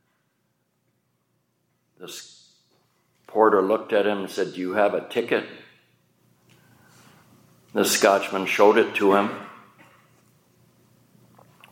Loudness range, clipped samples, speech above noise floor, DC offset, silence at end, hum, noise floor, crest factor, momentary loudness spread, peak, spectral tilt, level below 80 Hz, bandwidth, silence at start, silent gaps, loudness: 7 LU; under 0.1%; 50 dB; under 0.1%; 2.15 s; 60 Hz at -60 dBFS; -72 dBFS; 24 dB; 21 LU; -2 dBFS; -3.5 dB/octave; -80 dBFS; 17 kHz; 2 s; none; -21 LUFS